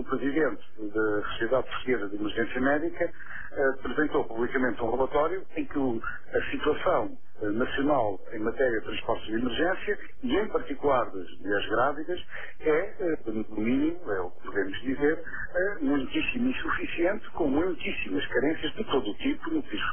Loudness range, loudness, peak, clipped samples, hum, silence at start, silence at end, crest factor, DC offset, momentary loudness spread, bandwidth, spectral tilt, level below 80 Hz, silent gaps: 1 LU; -29 LUFS; -12 dBFS; under 0.1%; none; 0 s; 0 s; 16 dB; 3%; 7 LU; 3.5 kHz; -8 dB/octave; -48 dBFS; none